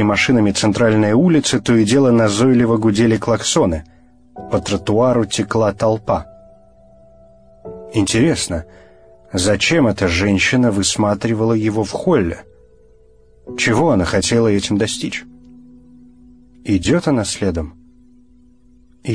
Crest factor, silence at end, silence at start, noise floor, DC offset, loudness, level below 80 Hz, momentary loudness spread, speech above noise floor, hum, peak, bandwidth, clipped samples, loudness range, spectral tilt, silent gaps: 14 dB; 0 s; 0 s; -50 dBFS; 0.3%; -16 LUFS; -40 dBFS; 11 LU; 35 dB; none; -2 dBFS; 10.5 kHz; under 0.1%; 8 LU; -5 dB/octave; none